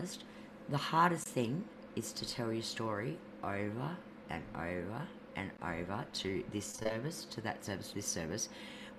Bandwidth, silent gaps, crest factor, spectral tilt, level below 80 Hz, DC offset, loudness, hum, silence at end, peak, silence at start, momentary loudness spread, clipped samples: 14.5 kHz; none; 24 dB; -4 dB/octave; -64 dBFS; under 0.1%; -39 LUFS; none; 0 s; -16 dBFS; 0 s; 10 LU; under 0.1%